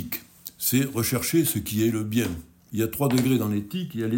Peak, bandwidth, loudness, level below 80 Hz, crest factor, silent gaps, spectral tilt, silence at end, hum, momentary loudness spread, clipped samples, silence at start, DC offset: -10 dBFS; 17 kHz; -25 LUFS; -52 dBFS; 16 dB; none; -5 dB/octave; 0 s; none; 11 LU; under 0.1%; 0 s; under 0.1%